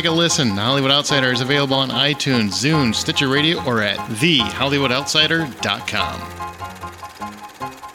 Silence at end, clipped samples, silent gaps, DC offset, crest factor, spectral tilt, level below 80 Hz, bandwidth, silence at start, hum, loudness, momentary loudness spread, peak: 0 s; under 0.1%; none; under 0.1%; 16 dB; -3.5 dB/octave; -50 dBFS; 17 kHz; 0 s; none; -17 LUFS; 17 LU; -2 dBFS